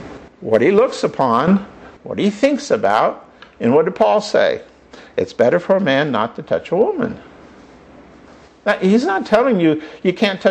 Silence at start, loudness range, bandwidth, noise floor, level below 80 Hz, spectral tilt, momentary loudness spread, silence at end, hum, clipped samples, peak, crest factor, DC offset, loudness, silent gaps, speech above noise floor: 0 s; 3 LU; 9 kHz; -44 dBFS; -54 dBFS; -6 dB/octave; 11 LU; 0 s; none; under 0.1%; -2 dBFS; 14 dB; under 0.1%; -16 LUFS; none; 28 dB